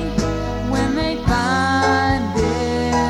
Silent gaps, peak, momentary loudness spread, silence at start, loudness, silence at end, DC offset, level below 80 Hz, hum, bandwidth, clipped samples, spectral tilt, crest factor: none; -4 dBFS; 5 LU; 0 s; -19 LUFS; 0 s; under 0.1%; -30 dBFS; none; 15 kHz; under 0.1%; -5.5 dB/octave; 14 dB